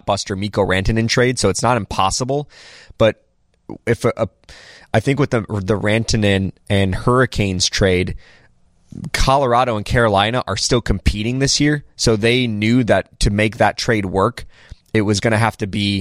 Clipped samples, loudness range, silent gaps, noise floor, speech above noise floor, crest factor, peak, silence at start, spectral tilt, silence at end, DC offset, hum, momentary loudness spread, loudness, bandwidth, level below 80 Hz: under 0.1%; 4 LU; none; -53 dBFS; 36 dB; 16 dB; -2 dBFS; 0.05 s; -5 dB/octave; 0 s; under 0.1%; none; 7 LU; -17 LUFS; 15 kHz; -32 dBFS